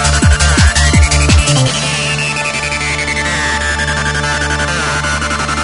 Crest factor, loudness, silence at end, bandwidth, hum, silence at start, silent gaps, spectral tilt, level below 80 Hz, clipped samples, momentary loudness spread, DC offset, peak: 12 dB; -12 LUFS; 0 s; 11 kHz; none; 0 s; none; -3.5 dB/octave; -18 dBFS; under 0.1%; 5 LU; under 0.1%; 0 dBFS